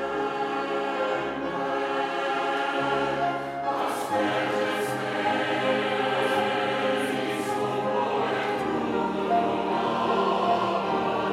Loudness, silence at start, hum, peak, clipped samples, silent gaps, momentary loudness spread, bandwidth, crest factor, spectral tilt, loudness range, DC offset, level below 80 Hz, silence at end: -26 LUFS; 0 s; none; -12 dBFS; under 0.1%; none; 4 LU; 16 kHz; 14 dB; -5 dB/octave; 2 LU; under 0.1%; -62 dBFS; 0 s